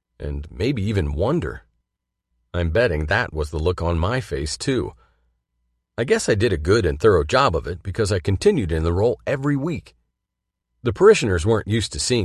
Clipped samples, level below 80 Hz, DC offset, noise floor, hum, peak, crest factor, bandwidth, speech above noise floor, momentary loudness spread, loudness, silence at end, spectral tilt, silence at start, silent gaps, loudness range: under 0.1%; -32 dBFS; under 0.1%; -81 dBFS; none; -2 dBFS; 20 dB; 12.5 kHz; 61 dB; 11 LU; -21 LUFS; 0 s; -5.5 dB/octave; 0.2 s; none; 4 LU